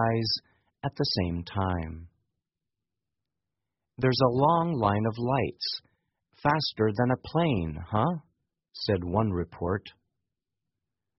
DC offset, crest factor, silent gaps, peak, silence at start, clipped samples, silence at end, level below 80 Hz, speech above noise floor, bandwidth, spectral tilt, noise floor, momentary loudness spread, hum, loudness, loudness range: under 0.1%; 22 dB; none; -8 dBFS; 0 s; under 0.1%; 1.3 s; -52 dBFS; 61 dB; 6 kHz; -5 dB/octave; -88 dBFS; 11 LU; none; -28 LUFS; 6 LU